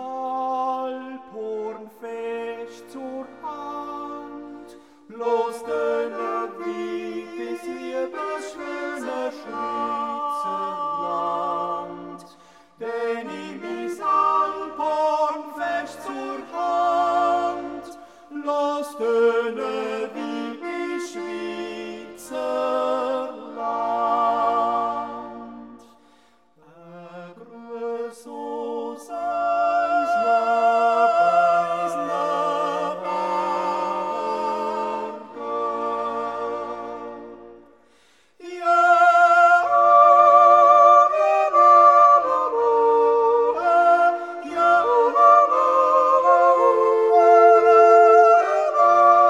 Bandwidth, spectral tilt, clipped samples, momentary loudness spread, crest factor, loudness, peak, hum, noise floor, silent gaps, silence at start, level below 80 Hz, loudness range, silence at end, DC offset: 11.5 kHz; -4.5 dB/octave; under 0.1%; 20 LU; 18 dB; -19 LUFS; -2 dBFS; none; -59 dBFS; none; 0 s; -66 dBFS; 15 LU; 0 s; under 0.1%